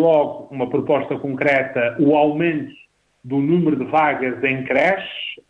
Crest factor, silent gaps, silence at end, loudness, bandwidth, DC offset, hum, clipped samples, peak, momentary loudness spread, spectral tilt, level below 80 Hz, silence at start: 14 dB; none; 0.15 s; -19 LUFS; 7.2 kHz; under 0.1%; none; under 0.1%; -4 dBFS; 9 LU; -8 dB/octave; -60 dBFS; 0 s